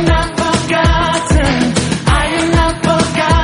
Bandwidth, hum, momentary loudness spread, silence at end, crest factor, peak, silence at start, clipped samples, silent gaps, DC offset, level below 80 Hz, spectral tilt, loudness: 11 kHz; none; 2 LU; 0 s; 12 dB; 0 dBFS; 0 s; under 0.1%; none; under 0.1%; -20 dBFS; -5 dB/octave; -13 LUFS